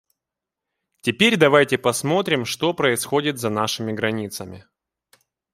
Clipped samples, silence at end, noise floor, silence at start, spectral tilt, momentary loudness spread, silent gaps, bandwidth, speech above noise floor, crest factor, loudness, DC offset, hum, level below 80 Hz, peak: under 0.1%; 0.95 s; -86 dBFS; 1.05 s; -4 dB/octave; 12 LU; none; 16 kHz; 65 dB; 20 dB; -20 LUFS; under 0.1%; none; -64 dBFS; -2 dBFS